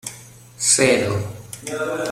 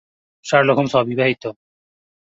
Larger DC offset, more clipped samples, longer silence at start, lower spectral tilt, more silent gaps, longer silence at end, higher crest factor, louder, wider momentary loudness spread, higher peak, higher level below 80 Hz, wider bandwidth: neither; neither; second, 0.05 s vs 0.45 s; second, -3 dB/octave vs -5.5 dB/octave; neither; second, 0 s vs 0.8 s; about the same, 20 dB vs 18 dB; about the same, -19 LUFS vs -17 LUFS; first, 18 LU vs 15 LU; about the same, -2 dBFS vs -2 dBFS; about the same, -54 dBFS vs -58 dBFS; first, 16.5 kHz vs 7.8 kHz